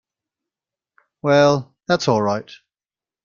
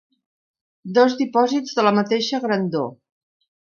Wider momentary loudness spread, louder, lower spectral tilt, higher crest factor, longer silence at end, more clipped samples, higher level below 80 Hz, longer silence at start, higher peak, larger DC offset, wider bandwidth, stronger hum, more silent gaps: about the same, 10 LU vs 8 LU; about the same, -19 LUFS vs -20 LUFS; about the same, -5.5 dB/octave vs -5.5 dB/octave; about the same, 20 dB vs 20 dB; about the same, 0.7 s vs 0.8 s; neither; first, -60 dBFS vs -72 dBFS; first, 1.25 s vs 0.85 s; about the same, -2 dBFS vs -2 dBFS; neither; about the same, 7.4 kHz vs 7.2 kHz; neither; neither